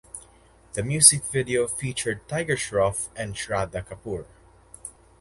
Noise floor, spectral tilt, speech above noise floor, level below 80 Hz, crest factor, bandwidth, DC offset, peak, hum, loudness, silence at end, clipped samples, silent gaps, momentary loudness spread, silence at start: -55 dBFS; -2.5 dB/octave; 30 dB; -50 dBFS; 26 dB; 12 kHz; under 0.1%; 0 dBFS; none; -23 LUFS; 0.3 s; under 0.1%; none; 26 LU; 0.15 s